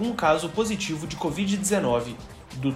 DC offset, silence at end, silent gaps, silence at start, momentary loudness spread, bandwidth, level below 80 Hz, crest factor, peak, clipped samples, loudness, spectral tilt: under 0.1%; 0 s; none; 0 s; 12 LU; 15.5 kHz; -50 dBFS; 16 dB; -8 dBFS; under 0.1%; -25 LUFS; -4.5 dB/octave